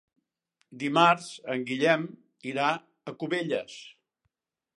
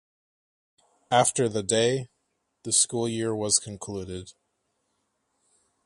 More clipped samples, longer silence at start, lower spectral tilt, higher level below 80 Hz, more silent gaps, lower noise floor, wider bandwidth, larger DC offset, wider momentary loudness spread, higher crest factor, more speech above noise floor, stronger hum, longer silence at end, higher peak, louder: neither; second, 0.7 s vs 1.1 s; first, -5 dB/octave vs -3 dB/octave; second, -82 dBFS vs -60 dBFS; neither; first, -81 dBFS vs -76 dBFS; about the same, 11.5 kHz vs 12 kHz; neither; first, 19 LU vs 16 LU; about the same, 24 dB vs 22 dB; about the same, 53 dB vs 51 dB; neither; second, 0.85 s vs 1.55 s; about the same, -6 dBFS vs -6 dBFS; about the same, -27 LUFS vs -25 LUFS